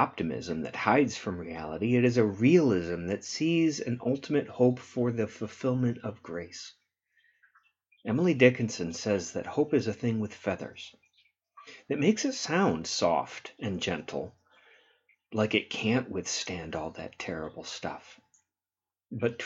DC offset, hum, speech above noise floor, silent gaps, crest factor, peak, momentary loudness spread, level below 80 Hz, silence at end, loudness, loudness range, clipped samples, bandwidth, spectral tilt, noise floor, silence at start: under 0.1%; none; over 61 dB; none; 24 dB; -4 dBFS; 15 LU; -64 dBFS; 0 s; -29 LUFS; 6 LU; under 0.1%; 8 kHz; -5.5 dB/octave; under -90 dBFS; 0 s